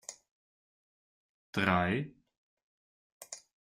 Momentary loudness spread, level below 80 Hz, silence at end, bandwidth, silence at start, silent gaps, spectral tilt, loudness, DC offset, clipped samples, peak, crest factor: 19 LU; -70 dBFS; 0.35 s; 15.5 kHz; 0.1 s; 0.31-1.53 s, 2.37-2.57 s, 2.63-3.21 s; -5 dB/octave; -32 LUFS; under 0.1%; under 0.1%; -14 dBFS; 24 dB